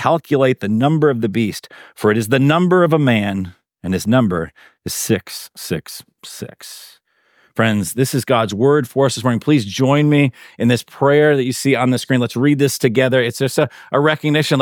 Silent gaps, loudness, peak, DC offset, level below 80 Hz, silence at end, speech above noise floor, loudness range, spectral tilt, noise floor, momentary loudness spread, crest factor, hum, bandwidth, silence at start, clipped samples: none; -16 LUFS; -2 dBFS; under 0.1%; -56 dBFS; 0 s; 41 dB; 7 LU; -5.5 dB/octave; -57 dBFS; 17 LU; 16 dB; none; 19 kHz; 0 s; under 0.1%